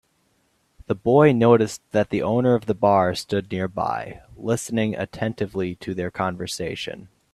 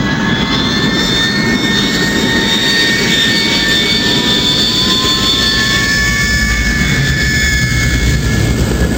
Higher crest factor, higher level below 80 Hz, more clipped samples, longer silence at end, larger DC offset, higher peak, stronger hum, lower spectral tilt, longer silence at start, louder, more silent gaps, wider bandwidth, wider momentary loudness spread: first, 20 dB vs 12 dB; second, -56 dBFS vs -22 dBFS; neither; first, 0.25 s vs 0 s; neither; about the same, -2 dBFS vs 0 dBFS; neither; first, -6 dB/octave vs -3.5 dB/octave; first, 0.9 s vs 0 s; second, -22 LUFS vs -11 LUFS; neither; second, 13.5 kHz vs 16 kHz; first, 13 LU vs 3 LU